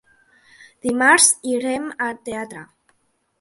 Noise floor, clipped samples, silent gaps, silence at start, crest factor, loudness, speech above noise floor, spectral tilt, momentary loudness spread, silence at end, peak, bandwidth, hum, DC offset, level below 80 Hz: -67 dBFS; under 0.1%; none; 0.85 s; 22 dB; -18 LUFS; 47 dB; -1 dB/octave; 18 LU; 0.75 s; 0 dBFS; 12 kHz; none; under 0.1%; -64 dBFS